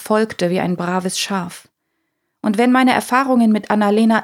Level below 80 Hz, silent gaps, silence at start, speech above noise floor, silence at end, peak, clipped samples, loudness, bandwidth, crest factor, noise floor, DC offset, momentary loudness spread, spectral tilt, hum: -64 dBFS; none; 0 s; 56 dB; 0 s; 0 dBFS; under 0.1%; -16 LUFS; 16 kHz; 16 dB; -72 dBFS; under 0.1%; 8 LU; -5 dB/octave; none